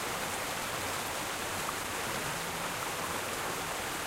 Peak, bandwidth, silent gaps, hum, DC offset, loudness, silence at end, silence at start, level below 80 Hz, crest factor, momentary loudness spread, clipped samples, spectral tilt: -22 dBFS; 16 kHz; none; none; under 0.1%; -34 LUFS; 0 s; 0 s; -58 dBFS; 14 dB; 1 LU; under 0.1%; -2 dB/octave